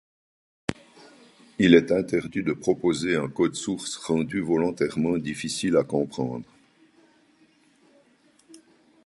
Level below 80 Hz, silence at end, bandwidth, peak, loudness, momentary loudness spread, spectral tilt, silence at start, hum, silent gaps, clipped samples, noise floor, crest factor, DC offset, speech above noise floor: -58 dBFS; 0.5 s; 11.5 kHz; -2 dBFS; -25 LUFS; 15 LU; -5.5 dB/octave; 0.7 s; none; none; under 0.1%; -61 dBFS; 24 dB; under 0.1%; 37 dB